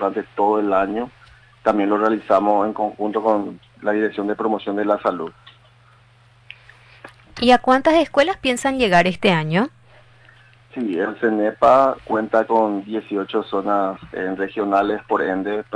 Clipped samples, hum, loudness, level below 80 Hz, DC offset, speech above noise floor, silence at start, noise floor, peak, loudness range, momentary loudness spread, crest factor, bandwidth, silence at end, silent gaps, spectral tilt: under 0.1%; none; -19 LUFS; -52 dBFS; under 0.1%; 33 dB; 0 s; -52 dBFS; -4 dBFS; 6 LU; 10 LU; 16 dB; 11 kHz; 0.15 s; none; -5.5 dB/octave